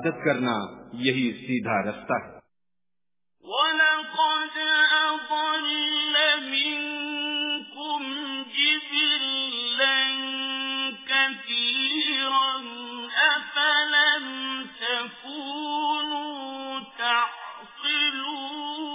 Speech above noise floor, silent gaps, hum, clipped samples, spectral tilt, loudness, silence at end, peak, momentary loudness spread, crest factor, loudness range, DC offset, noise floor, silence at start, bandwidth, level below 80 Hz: 63 dB; none; none; under 0.1%; 0.5 dB/octave; -24 LUFS; 0 s; -8 dBFS; 11 LU; 18 dB; 6 LU; under 0.1%; -90 dBFS; 0 s; 3.9 kHz; -72 dBFS